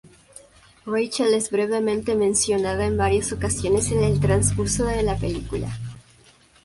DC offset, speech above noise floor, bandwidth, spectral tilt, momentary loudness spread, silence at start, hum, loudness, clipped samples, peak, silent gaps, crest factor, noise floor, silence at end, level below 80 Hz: under 0.1%; 32 dB; 11.5 kHz; -5 dB/octave; 9 LU; 0.85 s; none; -22 LUFS; under 0.1%; -6 dBFS; none; 16 dB; -54 dBFS; 0.65 s; -36 dBFS